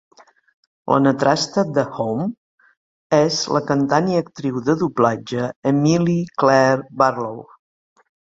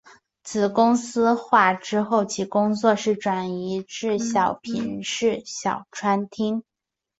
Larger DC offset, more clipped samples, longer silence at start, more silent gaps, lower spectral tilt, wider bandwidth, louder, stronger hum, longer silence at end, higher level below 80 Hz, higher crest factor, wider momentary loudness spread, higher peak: neither; neither; first, 0.85 s vs 0.45 s; first, 2.37-2.58 s, 2.77-3.10 s, 5.56-5.63 s vs none; about the same, -5.5 dB/octave vs -4.5 dB/octave; about the same, 7.8 kHz vs 8.2 kHz; first, -19 LUFS vs -23 LUFS; neither; first, 0.9 s vs 0.6 s; first, -58 dBFS vs -64 dBFS; about the same, 18 dB vs 20 dB; about the same, 9 LU vs 9 LU; about the same, -2 dBFS vs -4 dBFS